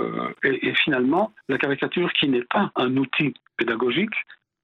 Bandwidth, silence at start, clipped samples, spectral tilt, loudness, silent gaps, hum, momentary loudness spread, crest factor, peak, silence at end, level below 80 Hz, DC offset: 5.6 kHz; 0 s; under 0.1%; -7.5 dB/octave; -23 LUFS; none; none; 6 LU; 18 dB; -6 dBFS; 0.3 s; -68 dBFS; under 0.1%